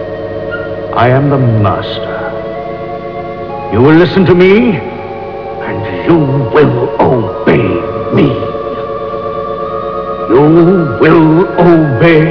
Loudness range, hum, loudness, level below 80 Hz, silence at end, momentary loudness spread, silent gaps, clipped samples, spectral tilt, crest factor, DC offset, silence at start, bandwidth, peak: 4 LU; none; -10 LUFS; -36 dBFS; 0 s; 14 LU; none; under 0.1%; -10 dB/octave; 10 dB; 0.5%; 0 s; 5.4 kHz; 0 dBFS